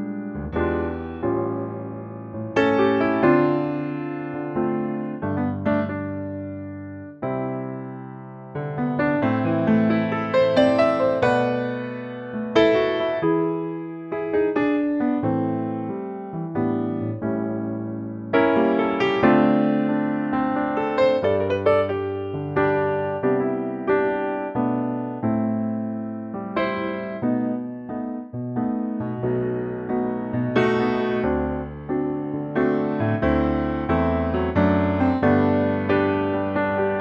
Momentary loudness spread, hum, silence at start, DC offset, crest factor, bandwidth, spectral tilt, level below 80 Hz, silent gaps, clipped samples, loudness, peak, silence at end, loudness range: 12 LU; none; 0 s; under 0.1%; 18 dB; 7.6 kHz; -8.5 dB/octave; -46 dBFS; none; under 0.1%; -23 LUFS; -4 dBFS; 0 s; 6 LU